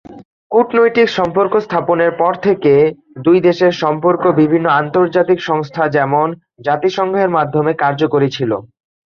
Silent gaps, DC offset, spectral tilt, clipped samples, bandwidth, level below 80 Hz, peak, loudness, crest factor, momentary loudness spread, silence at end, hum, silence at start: 0.25-0.50 s; under 0.1%; -7 dB/octave; under 0.1%; 7 kHz; -56 dBFS; 0 dBFS; -14 LUFS; 14 dB; 5 LU; 0.45 s; none; 0.1 s